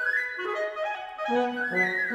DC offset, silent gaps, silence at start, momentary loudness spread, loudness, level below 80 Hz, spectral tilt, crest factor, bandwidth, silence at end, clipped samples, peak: under 0.1%; none; 0 s; 7 LU; -28 LUFS; -70 dBFS; -5 dB/octave; 16 dB; 14.5 kHz; 0 s; under 0.1%; -12 dBFS